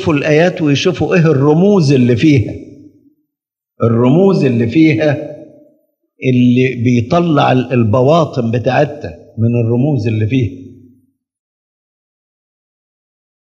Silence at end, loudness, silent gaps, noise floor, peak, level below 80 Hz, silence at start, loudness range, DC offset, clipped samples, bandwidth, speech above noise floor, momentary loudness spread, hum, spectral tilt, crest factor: 2.7 s; -12 LUFS; none; -81 dBFS; 0 dBFS; -52 dBFS; 0 s; 6 LU; under 0.1%; under 0.1%; 7.8 kHz; 70 dB; 8 LU; none; -7.5 dB/octave; 14 dB